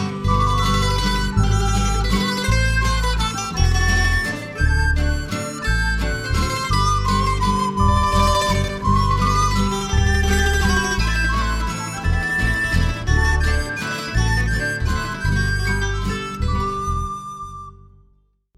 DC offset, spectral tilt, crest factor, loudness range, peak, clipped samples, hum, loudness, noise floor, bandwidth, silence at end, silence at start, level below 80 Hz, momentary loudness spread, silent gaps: under 0.1%; -4.5 dB/octave; 16 dB; 3 LU; -4 dBFS; under 0.1%; none; -20 LUFS; -58 dBFS; 15 kHz; 0.85 s; 0 s; -22 dBFS; 7 LU; none